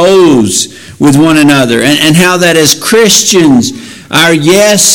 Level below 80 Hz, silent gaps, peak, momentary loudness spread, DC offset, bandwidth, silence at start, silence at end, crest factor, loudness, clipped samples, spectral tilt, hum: -40 dBFS; none; 0 dBFS; 7 LU; under 0.1%; over 20 kHz; 0 s; 0 s; 6 dB; -5 LUFS; 1%; -3.5 dB/octave; none